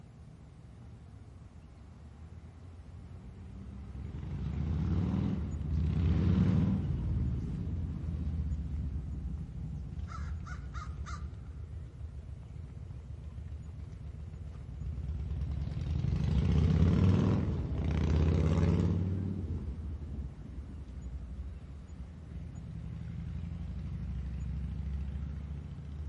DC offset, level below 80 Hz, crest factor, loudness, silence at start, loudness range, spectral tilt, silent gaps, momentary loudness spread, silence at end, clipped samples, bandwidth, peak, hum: under 0.1%; -42 dBFS; 20 dB; -35 LUFS; 0 s; 15 LU; -9 dB/octave; none; 21 LU; 0 s; under 0.1%; 7.8 kHz; -14 dBFS; none